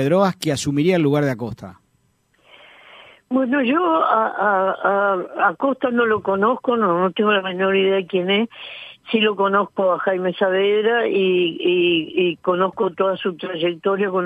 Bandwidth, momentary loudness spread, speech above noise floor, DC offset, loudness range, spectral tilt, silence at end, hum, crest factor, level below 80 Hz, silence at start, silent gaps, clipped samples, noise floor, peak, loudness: 14 kHz; 6 LU; 44 dB; under 0.1%; 4 LU; -5.5 dB/octave; 0 s; none; 16 dB; -62 dBFS; 0 s; none; under 0.1%; -63 dBFS; -4 dBFS; -19 LUFS